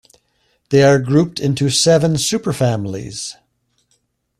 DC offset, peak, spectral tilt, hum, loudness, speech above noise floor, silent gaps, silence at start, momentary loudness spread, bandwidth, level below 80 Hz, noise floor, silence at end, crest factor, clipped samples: under 0.1%; -2 dBFS; -5 dB/octave; none; -15 LUFS; 50 dB; none; 0.7 s; 14 LU; 13.5 kHz; -50 dBFS; -65 dBFS; 1.1 s; 16 dB; under 0.1%